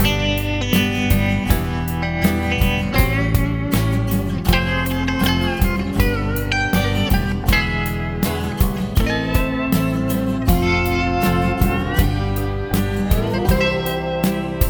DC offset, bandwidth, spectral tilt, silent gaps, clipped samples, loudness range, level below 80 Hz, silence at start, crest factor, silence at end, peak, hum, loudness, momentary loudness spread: under 0.1%; over 20 kHz; -5.5 dB/octave; none; under 0.1%; 1 LU; -24 dBFS; 0 s; 16 dB; 0 s; -2 dBFS; none; -19 LUFS; 4 LU